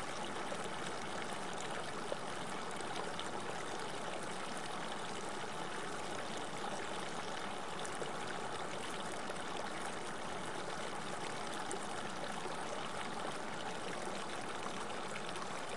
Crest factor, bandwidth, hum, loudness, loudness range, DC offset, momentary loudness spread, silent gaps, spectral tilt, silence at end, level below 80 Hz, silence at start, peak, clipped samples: 18 dB; 11.5 kHz; none; -42 LUFS; 0 LU; 0.5%; 1 LU; none; -3 dB/octave; 0 s; -74 dBFS; 0 s; -24 dBFS; under 0.1%